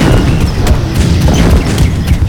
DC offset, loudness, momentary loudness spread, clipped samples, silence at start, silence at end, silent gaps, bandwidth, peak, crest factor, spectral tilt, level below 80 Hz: under 0.1%; -10 LUFS; 3 LU; 0.3%; 0 s; 0 s; none; 18.5 kHz; 0 dBFS; 8 dB; -6 dB/octave; -12 dBFS